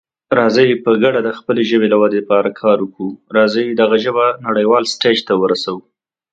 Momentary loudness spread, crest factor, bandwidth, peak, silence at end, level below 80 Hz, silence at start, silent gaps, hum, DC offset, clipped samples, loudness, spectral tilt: 6 LU; 14 dB; 9.2 kHz; 0 dBFS; 0.55 s; -62 dBFS; 0.3 s; none; none; under 0.1%; under 0.1%; -14 LUFS; -5 dB/octave